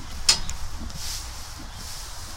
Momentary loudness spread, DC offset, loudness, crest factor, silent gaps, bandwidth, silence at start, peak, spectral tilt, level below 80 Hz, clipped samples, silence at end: 17 LU; under 0.1%; -27 LUFS; 28 dB; none; 16.5 kHz; 0 s; 0 dBFS; -0.5 dB/octave; -36 dBFS; under 0.1%; 0 s